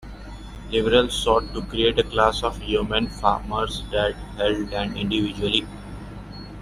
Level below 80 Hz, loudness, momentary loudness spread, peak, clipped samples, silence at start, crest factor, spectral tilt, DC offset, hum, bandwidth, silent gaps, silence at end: -36 dBFS; -23 LUFS; 19 LU; -2 dBFS; under 0.1%; 0 s; 20 dB; -4.5 dB/octave; under 0.1%; 50 Hz at -35 dBFS; 14 kHz; none; 0 s